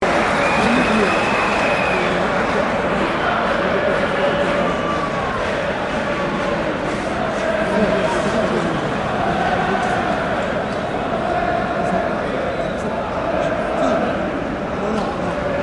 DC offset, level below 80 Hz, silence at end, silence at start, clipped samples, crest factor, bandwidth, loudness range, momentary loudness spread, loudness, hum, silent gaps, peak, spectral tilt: under 0.1%; -38 dBFS; 0 s; 0 s; under 0.1%; 16 dB; 11.5 kHz; 4 LU; 5 LU; -19 LUFS; none; none; -4 dBFS; -5.5 dB/octave